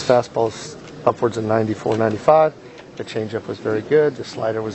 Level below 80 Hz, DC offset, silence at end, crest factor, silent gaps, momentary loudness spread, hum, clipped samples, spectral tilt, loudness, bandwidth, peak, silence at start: -56 dBFS; under 0.1%; 0 s; 20 dB; none; 16 LU; none; under 0.1%; -6 dB/octave; -20 LUFS; 8.4 kHz; 0 dBFS; 0 s